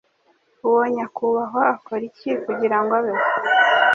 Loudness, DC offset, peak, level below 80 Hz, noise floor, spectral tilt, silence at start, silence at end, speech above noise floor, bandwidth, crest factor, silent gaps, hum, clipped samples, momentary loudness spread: -20 LUFS; under 0.1%; -2 dBFS; -70 dBFS; -62 dBFS; -5 dB/octave; 0.65 s; 0 s; 42 dB; 7.2 kHz; 18 dB; none; none; under 0.1%; 10 LU